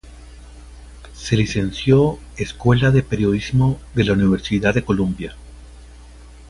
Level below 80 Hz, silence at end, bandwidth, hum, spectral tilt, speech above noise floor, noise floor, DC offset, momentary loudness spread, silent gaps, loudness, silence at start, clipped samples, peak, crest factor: -36 dBFS; 0.05 s; 11.5 kHz; none; -7 dB/octave; 23 dB; -41 dBFS; under 0.1%; 11 LU; none; -18 LUFS; 0.05 s; under 0.1%; -2 dBFS; 16 dB